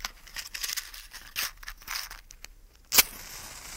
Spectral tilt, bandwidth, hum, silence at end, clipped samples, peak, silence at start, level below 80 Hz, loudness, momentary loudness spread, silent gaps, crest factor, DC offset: 1 dB/octave; 16.5 kHz; none; 0 s; under 0.1%; -2 dBFS; 0 s; -52 dBFS; -28 LUFS; 23 LU; none; 30 dB; under 0.1%